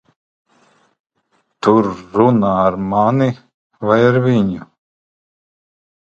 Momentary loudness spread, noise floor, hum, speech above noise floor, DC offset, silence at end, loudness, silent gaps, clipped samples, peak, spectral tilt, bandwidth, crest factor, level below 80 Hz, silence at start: 8 LU; -64 dBFS; none; 50 dB; under 0.1%; 1.5 s; -15 LUFS; 3.54-3.70 s; under 0.1%; 0 dBFS; -8.5 dB/octave; 7.8 kHz; 18 dB; -50 dBFS; 1.65 s